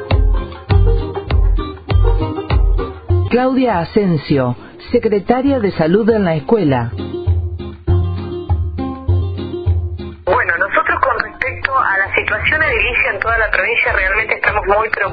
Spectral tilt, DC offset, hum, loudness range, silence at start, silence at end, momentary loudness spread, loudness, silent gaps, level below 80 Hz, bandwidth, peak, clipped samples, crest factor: -10 dB/octave; under 0.1%; none; 4 LU; 0 s; 0 s; 8 LU; -16 LUFS; none; -22 dBFS; 5 kHz; 0 dBFS; under 0.1%; 14 dB